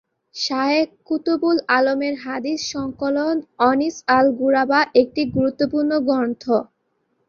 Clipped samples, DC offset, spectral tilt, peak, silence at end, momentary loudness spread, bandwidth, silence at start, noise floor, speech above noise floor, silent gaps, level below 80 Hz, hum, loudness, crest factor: under 0.1%; under 0.1%; -4.5 dB/octave; -2 dBFS; 0.65 s; 8 LU; 7.2 kHz; 0.35 s; -69 dBFS; 50 dB; none; -56 dBFS; none; -20 LUFS; 18 dB